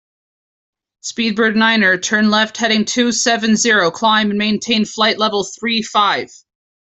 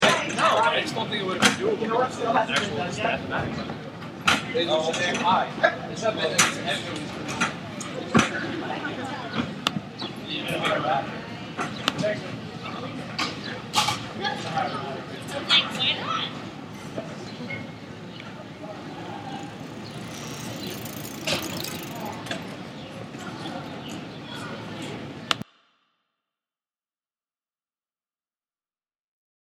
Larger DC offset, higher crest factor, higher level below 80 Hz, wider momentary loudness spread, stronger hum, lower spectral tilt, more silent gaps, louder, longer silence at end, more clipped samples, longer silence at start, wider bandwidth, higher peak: neither; second, 14 dB vs 28 dB; about the same, -58 dBFS vs -60 dBFS; second, 7 LU vs 16 LU; neither; about the same, -3 dB/octave vs -3 dB/octave; neither; first, -14 LUFS vs -26 LUFS; second, 0.6 s vs 4 s; neither; first, 1.05 s vs 0 s; second, 8.4 kHz vs 16.5 kHz; about the same, -2 dBFS vs 0 dBFS